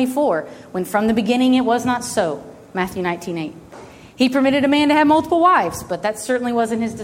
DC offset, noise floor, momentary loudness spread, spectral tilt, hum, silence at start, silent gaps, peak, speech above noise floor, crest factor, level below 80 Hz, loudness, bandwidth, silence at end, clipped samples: under 0.1%; -40 dBFS; 12 LU; -4.5 dB/octave; none; 0 s; none; -2 dBFS; 22 dB; 16 dB; -52 dBFS; -18 LUFS; 16.5 kHz; 0 s; under 0.1%